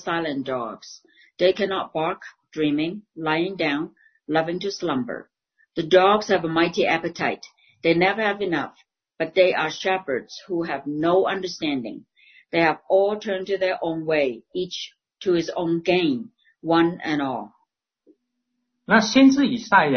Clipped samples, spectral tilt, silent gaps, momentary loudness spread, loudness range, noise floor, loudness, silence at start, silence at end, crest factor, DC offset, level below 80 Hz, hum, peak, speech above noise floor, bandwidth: under 0.1%; -5 dB/octave; none; 15 LU; 4 LU; -77 dBFS; -22 LUFS; 0 s; 0 s; 20 dB; under 0.1%; -62 dBFS; none; -2 dBFS; 55 dB; 6.6 kHz